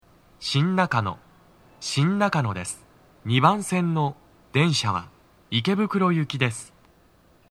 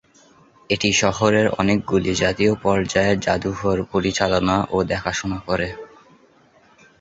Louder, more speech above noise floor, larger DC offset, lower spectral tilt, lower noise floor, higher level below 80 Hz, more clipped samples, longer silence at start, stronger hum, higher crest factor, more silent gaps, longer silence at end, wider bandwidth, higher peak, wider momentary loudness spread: second, -24 LUFS vs -20 LUFS; about the same, 35 dB vs 35 dB; neither; about the same, -5.5 dB/octave vs -4.5 dB/octave; first, -58 dBFS vs -54 dBFS; second, -62 dBFS vs -42 dBFS; neither; second, 0.4 s vs 0.7 s; neither; about the same, 22 dB vs 18 dB; neither; second, 0.85 s vs 1.15 s; first, 13.5 kHz vs 8 kHz; about the same, -2 dBFS vs -2 dBFS; first, 13 LU vs 7 LU